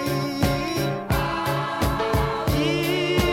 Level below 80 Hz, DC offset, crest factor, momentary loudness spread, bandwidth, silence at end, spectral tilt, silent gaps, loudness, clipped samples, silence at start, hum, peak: -34 dBFS; under 0.1%; 16 dB; 3 LU; 17 kHz; 0 s; -5.5 dB/octave; none; -23 LUFS; under 0.1%; 0 s; none; -6 dBFS